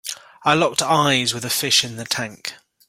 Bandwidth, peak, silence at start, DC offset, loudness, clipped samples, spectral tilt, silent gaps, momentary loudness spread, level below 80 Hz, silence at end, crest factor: 16.5 kHz; -2 dBFS; 0.05 s; under 0.1%; -19 LUFS; under 0.1%; -2.5 dB/octave; none; 14 LU; -60 dBFS; 0.35 s; 20 dB